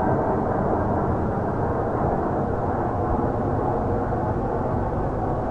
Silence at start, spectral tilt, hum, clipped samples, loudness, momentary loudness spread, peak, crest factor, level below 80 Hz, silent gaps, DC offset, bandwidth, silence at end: 0 s; -10.5 dB/octave; none; under 0.1%; -24 LUFS; 2 LU; -10 dBFS; 12 dB; -36 dBFS; none; under 0.1%; 8 kHz; 0 s